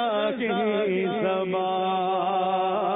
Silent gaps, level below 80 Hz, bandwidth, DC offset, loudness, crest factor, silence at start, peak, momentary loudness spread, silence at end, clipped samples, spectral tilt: none; -70 dBFS; 4 kHz; under 0.1%; -25 LUFS; 10 dB; 0 s; -14 dBFS; 1 LU; 0 s; under 0.1%; -10 dB/octave